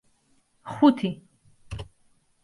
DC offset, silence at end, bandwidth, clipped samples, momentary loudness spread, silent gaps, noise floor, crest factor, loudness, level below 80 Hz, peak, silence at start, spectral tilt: under 0.1%; 0.6 s; 11.5 kHz; under 0.1%; 24 LU; none; -66 dBFS; 22 dB; -22 LUFS; -52 dBFS; -6 dBFS; 0.65 s; -7.5 dB/octave